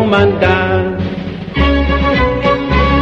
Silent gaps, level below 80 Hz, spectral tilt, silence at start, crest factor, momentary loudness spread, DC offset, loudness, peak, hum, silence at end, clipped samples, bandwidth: none; -20 dBFS; -7.5 dB/octave; 0 s; 12 dB; 9 LU; under 0.1%; -13 LUFS; 0 dBFS; none; 0 s; under 0.1%; 7 kHz